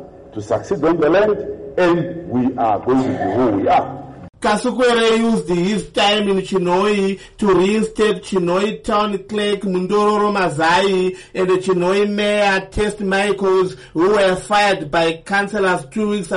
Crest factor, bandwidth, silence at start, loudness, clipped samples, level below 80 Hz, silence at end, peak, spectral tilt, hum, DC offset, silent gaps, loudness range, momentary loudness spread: 10 dB; 11.5 kHz; 0 s; -17 LUFS; under 0.1%; -44 dBFS; 0 s; -6 dBFS; -5 dB/octave; none; under 0.1%; none; 1 LU; 7 LU